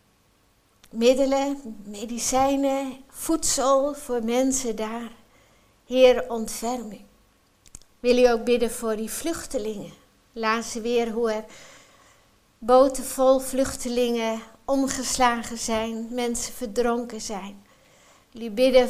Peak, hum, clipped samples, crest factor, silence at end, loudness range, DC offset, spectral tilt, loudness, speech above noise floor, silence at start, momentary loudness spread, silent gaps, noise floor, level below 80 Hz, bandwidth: -4 dBFS; none; under 0.1%; 20 dB; 0 s; 4 LU; under 0.1%; -3 dB/octave; -24 LUFS; 39 dB; 0.95 s; 16 LU; none; -62 dBFS; -48 dBFS; 15.5 kHz